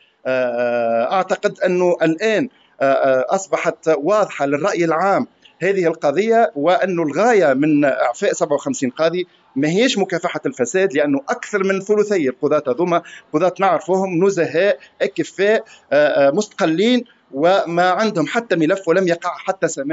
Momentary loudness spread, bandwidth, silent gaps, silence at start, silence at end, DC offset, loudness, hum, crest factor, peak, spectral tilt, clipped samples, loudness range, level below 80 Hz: 6 LU; 8 kHz; none; 0.25 s; 0 s; under 0.1%; -18 LUFS; none; 14 dB; -4 dBFS; -5 dB/octave; under 0.1%; 2 LU; -74 dBFS